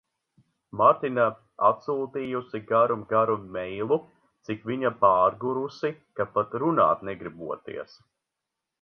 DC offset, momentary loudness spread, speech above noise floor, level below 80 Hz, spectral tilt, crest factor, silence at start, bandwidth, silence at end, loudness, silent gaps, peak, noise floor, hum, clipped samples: under 0.1%; 15 LU; 60 dB; -66 dBFS; -8 dB/octave; 22 dB; 0.75 s; 6.4 kHz; 0.95 s; -26 LUFS; none; -4 dBFS; -85 dBFS; none; under 0.1%